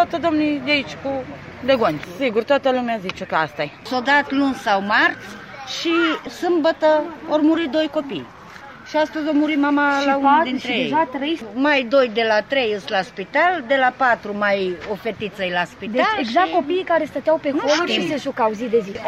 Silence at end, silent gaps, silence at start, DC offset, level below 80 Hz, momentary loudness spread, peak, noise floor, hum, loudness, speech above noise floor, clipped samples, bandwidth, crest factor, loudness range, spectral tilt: 0 s; none; 0 s; under 0.1%; -56 dBFS; 10 LU; -4 dBFS; -39 dBFS; none; -19 LUFS; 20 dB; under 0.1%; 13 kHz; 16 dB; 2 LU; -4.5 dB/octave